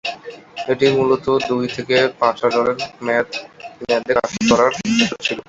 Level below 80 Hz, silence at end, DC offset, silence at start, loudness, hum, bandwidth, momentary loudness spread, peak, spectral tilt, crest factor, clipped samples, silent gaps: -52 dBFS; 0.1 s; under 0.1%; 0.05 s; -18 LUFS; none; 8 kHz; 14 LU; 0 dBFS; -4 dB/octave; 18 dB; under 0.1%; none